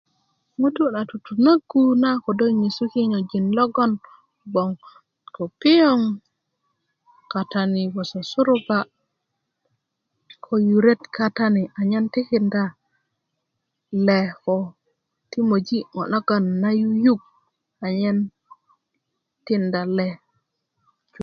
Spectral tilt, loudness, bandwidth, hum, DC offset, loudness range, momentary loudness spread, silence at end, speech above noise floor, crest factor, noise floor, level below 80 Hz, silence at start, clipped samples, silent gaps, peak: -7.5 dB/octave; -21 LUFS; 6.8 kHz; none; under 0.1%; 5 LU; 12 LU; 0 s; 58 dB; 18 dB; -78 dBFS; -68 dBFS; 0.6 s; under 0.1%; none; -4 dBFS